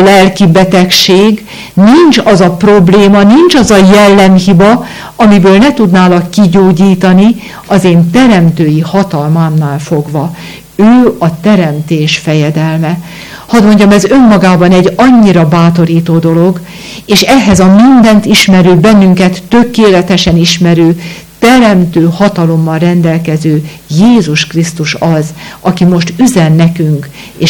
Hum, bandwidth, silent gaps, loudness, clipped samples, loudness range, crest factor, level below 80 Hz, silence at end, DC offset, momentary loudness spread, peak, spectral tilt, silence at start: none; 18.5 kHz; none; -6 LUFS; 7%; 5 LU; 6 dB; -34 dBFS; 0 s; under 0.1%; 9 LU; 0 dBFS; -6 dB/octave; 0 s